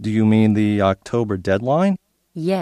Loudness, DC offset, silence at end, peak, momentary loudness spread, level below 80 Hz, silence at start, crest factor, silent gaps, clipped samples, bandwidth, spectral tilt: -19 LUFS; under 0.1%; 0 s; -2 dBFS; 11 LU; -54 dBFS; 0 s; 16 dB; none; under 0.1%; 10.5 kHz; -8 dB/octave